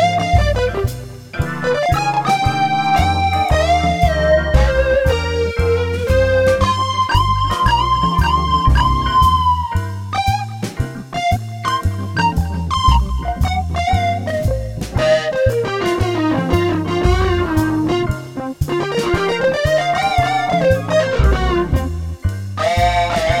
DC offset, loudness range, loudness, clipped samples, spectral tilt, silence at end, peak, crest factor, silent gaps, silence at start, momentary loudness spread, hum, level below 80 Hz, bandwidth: 0.3%; 3 LU; -17 LUFS; under 0.1%; -6 dB/octave; 0 s; 0 dBFS; 16 dB; none; 0 s; 8 LU; none; -24 dBFS; 16 kHz